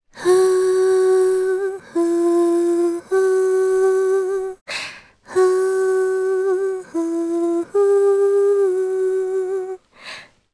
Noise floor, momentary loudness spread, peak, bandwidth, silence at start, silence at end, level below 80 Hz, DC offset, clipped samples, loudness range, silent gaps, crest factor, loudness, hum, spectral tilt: -38 dBFS; 11 LU; -6 dBFS; 11 kHz; 0.15 s; 0.3 s; -64 dBFS; under 0.1%; under 0.1%; 3 LU; 4.61-4.66 s; 12 dB; -18 LUFS; none; -4 dB/octave